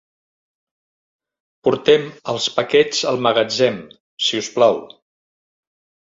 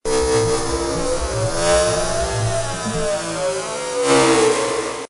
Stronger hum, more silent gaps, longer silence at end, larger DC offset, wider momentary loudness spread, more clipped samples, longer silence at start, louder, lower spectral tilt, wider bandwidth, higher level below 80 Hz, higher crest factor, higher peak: neither; first, 4.00-4.17 s vs none; first, 1.25 s vs 0.05 s; neither; about the same, 7 LU vs 8 LU; neither; first, 1.65 s vs 0.05 s; about the same, -18 LUFS vs -19 LUFS; about the same, -3.5 dB/octave vs -3.5 dB/octave; second, 7.8 kHz vs 11.5 kHz; second, -64 dBFS vs -32 dBFS; first, 20 dB vs 12 dB; first, 0 dBFS vs -6 dBFS